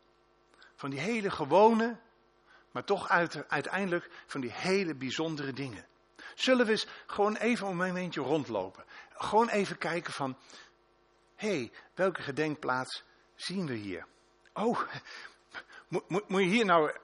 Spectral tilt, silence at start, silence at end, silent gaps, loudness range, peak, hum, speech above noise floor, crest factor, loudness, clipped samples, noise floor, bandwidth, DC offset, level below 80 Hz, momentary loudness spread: -5 dB/octave; 0.8 s; 0.05 s; none; 6 LU; -10 dBFS; none; 36 dB; 22 dB; -31 LUFS; under 0.1%; -67 dBFS; 10.5 kHz; under 0.1%; -72 dBFS; 17 LU